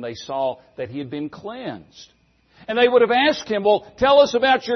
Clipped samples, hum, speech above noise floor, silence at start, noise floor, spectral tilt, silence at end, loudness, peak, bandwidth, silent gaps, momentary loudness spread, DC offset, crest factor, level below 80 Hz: under 0.1%; none; 33 dB; 0 s; -53 dBFS; -4 dB/octave; 0 s; -19 LUFS; -4 dBFS; 6.4 kHz; none; 17 LU; under 0.1%; 16 dB; -54 dBFS